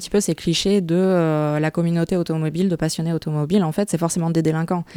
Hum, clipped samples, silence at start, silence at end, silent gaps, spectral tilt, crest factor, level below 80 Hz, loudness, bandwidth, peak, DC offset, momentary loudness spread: none; under 0.1%; 0 s; 0 s; none; -6 dB/octave; 14 dB; -48 dBFS; -20 LUFS; 16 kHz; -6 dBFS; under 0.1%; 4 LU